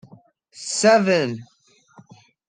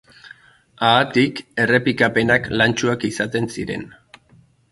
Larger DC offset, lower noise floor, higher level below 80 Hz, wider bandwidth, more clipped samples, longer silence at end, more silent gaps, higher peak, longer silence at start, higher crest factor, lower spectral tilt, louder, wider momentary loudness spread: neither; about the same, -52 dBFS vs -54 dBFS; second, -74 dBFS vs -50 dBFS; second, 10 kHz vs 11.5 kHz; neither; first, 1.05 s vs 0.85 s; neither; second, -4 dBFS vs 0 dBFS; first, 0.55 s vs 0.25 s; about the same, 18 dB vs 20 dB; about the same, -4 dB/octave vs -5 dB/octave; about the same, -19 LUFS vs -18 LUFS; first, 19 LU vs 11 LU